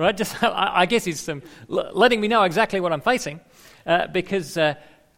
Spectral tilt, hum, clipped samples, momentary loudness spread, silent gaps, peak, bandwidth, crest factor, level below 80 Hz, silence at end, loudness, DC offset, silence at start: -4 dB/octave; none; under 0.1%; 14 LU; none; -4 dBFS; 16.5 kHz; 18 dB; -54 dBFS; 0.4 s; -21 LUFS; under 0.1%; 0 s